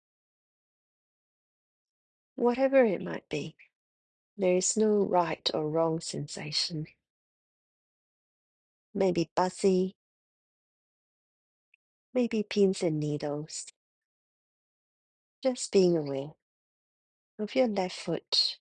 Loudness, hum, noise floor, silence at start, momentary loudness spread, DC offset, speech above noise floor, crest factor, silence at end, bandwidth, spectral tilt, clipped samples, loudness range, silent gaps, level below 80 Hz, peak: -29 LUFS; none; under -90 dBFS; 2.4 s; 13 LU; under 0.1%; over 62 dB; 20 dB; 0.05 s; 10 kHz; -4.5 dB/octave; under 0.1%; 5 LU; 3.75-4.37 s, 7.10-8.93 s, 9.31-9.36 s, 9.95-12.13 s, 13.76-15.42 s, 16.42-17.38 s, 18.28-18.32 s; -72 dBFS; -12 dBFS